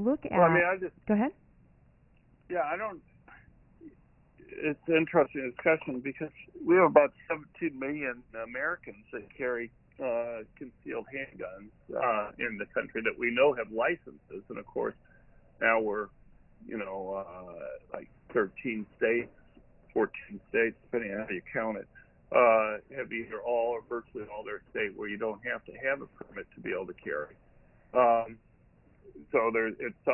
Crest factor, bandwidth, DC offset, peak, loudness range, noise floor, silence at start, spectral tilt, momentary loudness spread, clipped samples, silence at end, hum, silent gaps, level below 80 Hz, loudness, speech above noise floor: 24 dB; 3.3 kHz; under 0.1%; -8 dBFS; 7 LU; -63 dBFS; 0 s; -9.5 dB/octave; 18 LU; under 0.1%; 0 s; none; none; -64 dBFS; -31 LUFS; 32 dB